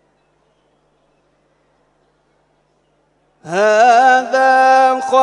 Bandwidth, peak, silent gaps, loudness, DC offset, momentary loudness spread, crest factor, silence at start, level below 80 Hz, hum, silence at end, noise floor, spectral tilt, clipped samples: 10.5 kHz; 0 dBFS; none; -11 LUFS; under 0.1%; 6 LU; 16 dB; 3.45 s; -72 dBFS; 50 Hz at -65 dBFS; 0 s; -60 dBFS; -3 dB/octave; under 0.1%